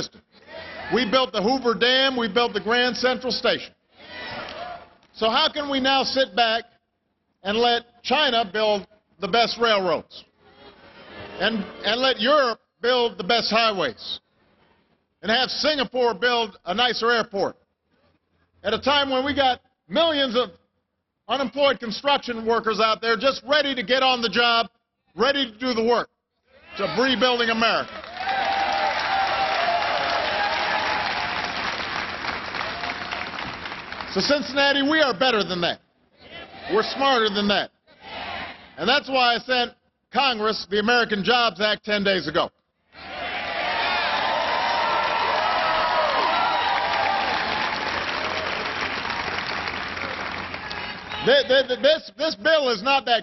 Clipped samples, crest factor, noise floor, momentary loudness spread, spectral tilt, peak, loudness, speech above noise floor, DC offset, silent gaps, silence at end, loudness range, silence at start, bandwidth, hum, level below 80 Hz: under 0.1%; 18 dB; -76 dBFS; 12 LU; -4 dB/octave; -6 dBFS; -22 LUFS; 54 dB; under 0.1%; none; 0 s; 3 LU; 0 s; 6.4 kHz; none; -56 dBFS